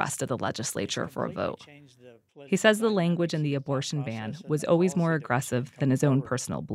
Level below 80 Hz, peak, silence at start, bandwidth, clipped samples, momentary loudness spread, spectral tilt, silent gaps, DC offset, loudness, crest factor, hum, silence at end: -66 dBFS; -8 dBFS; 0 s; 15.5 kHz; under 0.1%; 9 LU; -5.5 dB/octave; none; under 0.1%; -27 LUFS; 20 dB; none; 0 s